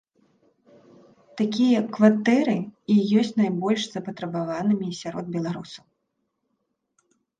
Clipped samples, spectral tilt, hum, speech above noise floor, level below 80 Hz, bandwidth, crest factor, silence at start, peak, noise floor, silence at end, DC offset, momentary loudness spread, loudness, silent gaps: under 0.1%; -6.5 dB/octave; none; 54 dB; -68 dBFS; 9 kHz; 22 dB; 1.35 s; -4 dBFS; -77 dBFS; 1.65 s; under 0.1%; 13 LU; -23 LUFS; none